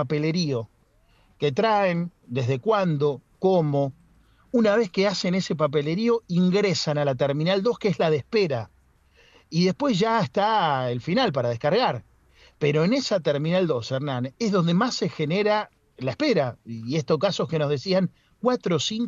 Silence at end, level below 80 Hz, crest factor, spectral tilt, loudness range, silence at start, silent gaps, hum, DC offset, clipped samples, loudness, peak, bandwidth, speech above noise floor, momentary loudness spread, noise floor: 0 s; -62 dBFS; 16 dB; -6 dB/octave; 2 LU; 0 s; none; none; under 0.1%; under 0.1%; -24 LUFS; -8 dBFS; 7.6 kHz; 38 dB; 7 LU; -60 dBFS